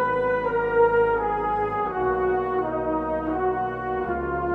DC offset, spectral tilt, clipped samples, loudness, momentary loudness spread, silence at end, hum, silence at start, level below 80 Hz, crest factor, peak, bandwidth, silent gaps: under 0.1%; -9 dB/octave; under 0.1%; -24 LUFS; 7 LU; 0 s; none; 0 s; -44 dBFS; 16 dB; -8 dBFS; 4.5 kHz; none